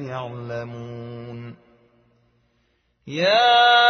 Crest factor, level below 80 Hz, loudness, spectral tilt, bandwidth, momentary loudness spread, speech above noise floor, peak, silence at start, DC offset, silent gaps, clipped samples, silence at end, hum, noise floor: 18 dB; -66 dBFS; -19 LUFS; -0.5 dB/octave; 6.4 kHz; 22 LU; 47 dB; -4 dBFS; 0 s; under 0.1%; none; under 0.1%; 0 s; none; -67 dBFS